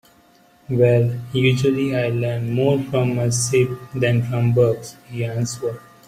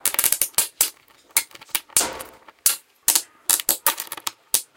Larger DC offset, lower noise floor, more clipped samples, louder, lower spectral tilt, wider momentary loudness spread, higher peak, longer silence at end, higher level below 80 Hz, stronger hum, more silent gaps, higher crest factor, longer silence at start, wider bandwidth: neither; first, -53 dBFS vs -41 dBFS; neither; about the same, -20 LUFS vs -21 LUFS; first, -6 dB/octave vs 1.5 dB/octave; about the same, 9 LU vs 9 LU; second, -4 dBFS vs 0 dBFS; first, 0.3 s vs 0.15 s; first, -54 dBFS vs -60 dBFS; neither; neither; second, 16 dB vs 24 dB; first, 0.7 s vs 0.05 s; second, 14.5 kHz vs over 20 kHz